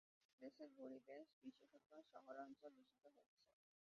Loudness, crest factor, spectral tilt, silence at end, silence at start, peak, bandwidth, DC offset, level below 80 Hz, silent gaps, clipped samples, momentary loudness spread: -62 LUFS; 20 dB; -3.5 dB/octave; 0.45 s; 0.4 s; -44 dBFS; 6.8 kHz; under 0.1%; under -90 dBFS; 1.33-1.42 s, 1.86-1.90 s, 3.26-3.37 s; under 0.1%; 8 LU